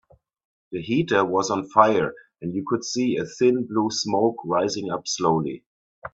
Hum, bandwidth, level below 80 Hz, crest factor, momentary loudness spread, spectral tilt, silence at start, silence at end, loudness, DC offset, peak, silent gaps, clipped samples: none; 8 kHz; -62 dBFS; 22 dB; 13 LU; -4.5 dB/octave; 0.7 s; 0.05 s; -23 LUFS; under 0.1%; -2 dBFS; 5.66-6.02 s; under 0.1%